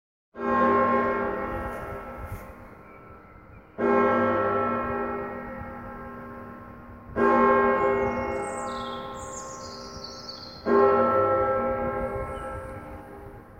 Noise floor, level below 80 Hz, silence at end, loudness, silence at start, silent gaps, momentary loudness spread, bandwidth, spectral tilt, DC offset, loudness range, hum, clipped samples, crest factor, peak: -49 dBFS; -48 dBFS; 0 s; -25 LUFS; 0.35 s; none; 21 LU; 15.5 kHz; -6 dB/octave; under 0.1%; 4 LU; none; under 0.1%; 20 dB; -8 dBFS